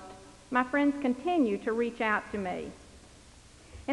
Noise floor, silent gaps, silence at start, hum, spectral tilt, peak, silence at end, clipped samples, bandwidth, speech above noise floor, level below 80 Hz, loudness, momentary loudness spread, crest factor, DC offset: -54 dBFS; none; 0 s; none; -5.5 dB/octave; -14 dBFS; 0 s; under 0.1%; 11.5 kHz; 25 dB; -58 dBFS; -30 LUFS; 16 LU; 18 dB; under 0.1%